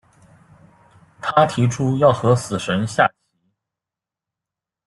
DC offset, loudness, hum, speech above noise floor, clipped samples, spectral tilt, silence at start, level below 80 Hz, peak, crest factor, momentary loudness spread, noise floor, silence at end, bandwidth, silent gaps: under 0.1%; -18 LUFS; none; 71 dB; under 0.1%; -6 dB/octave; 1.2 s; -56 dBFS; 0 dBFS; 20 dB; 6 LU; -88 dBFS; 1.8 s; 12 kHz; none